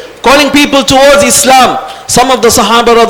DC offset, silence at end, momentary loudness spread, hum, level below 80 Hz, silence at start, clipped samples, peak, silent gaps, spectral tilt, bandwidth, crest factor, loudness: under 0.1%; 0 s; 5 LU; none; -32 dBFS; 0 s; 6%; 0 dBFS; none; -2.5 dB/octave; over 20 kHz; 6 dB; -5 LUFS